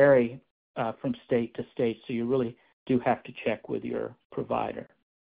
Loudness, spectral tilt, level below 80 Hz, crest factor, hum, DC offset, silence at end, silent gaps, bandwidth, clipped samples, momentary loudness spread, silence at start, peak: -30 LUFS; -6 dB/octave; -62 dBFS; 20 dB; none; under 0.1%; 0.4 s; 0.51-0.74 s, 2.73-2.86 s, 4.25-4.30 s; 4.9 kHz; under 0.1%; 11 LU; 0 s; -8 dBFS